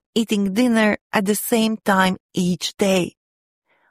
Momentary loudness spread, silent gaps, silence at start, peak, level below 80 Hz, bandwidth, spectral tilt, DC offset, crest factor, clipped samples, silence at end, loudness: 5 LU; 1.01-1.10 s, 2.20-2.29 s; 0.15 s; -2 dBFS; -58 dBFS; 15.5 kHz; -4.5 dB/octave; under 0.1%; 18 dB; under 0.1%; 0.8 s; -20 LUFS